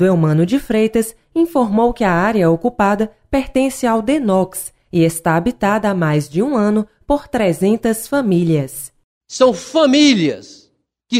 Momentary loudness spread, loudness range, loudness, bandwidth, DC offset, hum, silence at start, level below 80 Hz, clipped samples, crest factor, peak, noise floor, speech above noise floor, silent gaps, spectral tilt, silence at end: 7 LU; 2 LU; -16 LUFS; 16 kHz; under 0.1%; none; 0 s; -40 dBFS; under 0.1%; 14 dB; 0 dBFS; -58 dBFS; 43 dB; 9.04-9.21 s; -5.5 dB/octave; 0 s